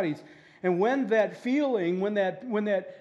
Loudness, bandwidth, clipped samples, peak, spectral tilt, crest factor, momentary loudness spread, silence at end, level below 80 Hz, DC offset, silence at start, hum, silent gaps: -27 LUFS; 8.4 kHz; under 0.1%; -12 dBFS; -7 dB/octave; 14 dB; 6 LU; 0 s; -82 dBFS; under 0.1%; 0 s; none; none